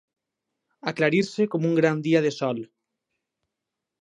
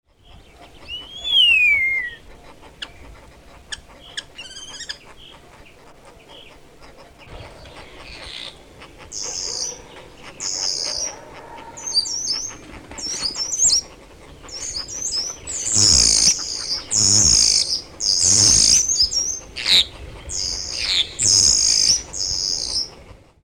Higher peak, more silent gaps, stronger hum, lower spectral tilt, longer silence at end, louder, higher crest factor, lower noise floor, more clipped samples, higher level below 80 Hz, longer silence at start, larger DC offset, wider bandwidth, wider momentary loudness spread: about the same, -6 dBFS vs -4 dBFS; neither; neither; first, -6.5 dB/octave vs 0.5 dB/octave; first, 1.4 s vs 0.3 s; second, -24 LUFS vs -16 LUFS; about the same, 20 dB vs 18 dB; first, -85 dBFS vs -47 dBFS; neither; second, -74 dBFS vs -42 dBFS; first, 0.85 s vs 0.35 s; neither; second, 9.8 kHz vs 19 kHz; second, 11 LU vs 23 LU